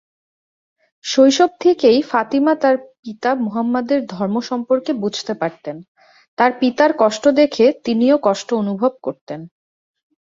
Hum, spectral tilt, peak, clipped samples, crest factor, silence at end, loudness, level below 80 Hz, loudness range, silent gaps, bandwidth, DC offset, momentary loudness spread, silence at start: none; -5 dB/octave; 0 dBFS; under 0.1%; 16 dB; 0.8 s; -17 LUFS; -64 dBFS; 4 LU; 2.99-3.03 s, 5.88-5.95 s, 6.28-6.37 s, 9.21-9.27 s; 7.8 kHz; under 0.1%; 16 LU; 1.05 s